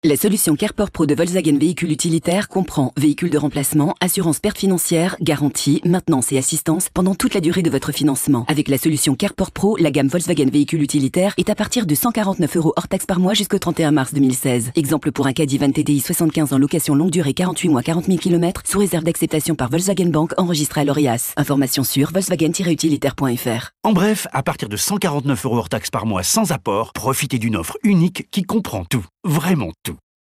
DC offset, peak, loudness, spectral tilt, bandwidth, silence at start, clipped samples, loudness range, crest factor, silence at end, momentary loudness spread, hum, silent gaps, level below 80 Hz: under 0.1%; -6 dBFS; -18 LUFS; -5 dB/octave; 15.5 kHz; 0.05 s; under 0.1%; 2 LU; 12 dB; 0.35 s; 4 LU; none; none; -46 dBFS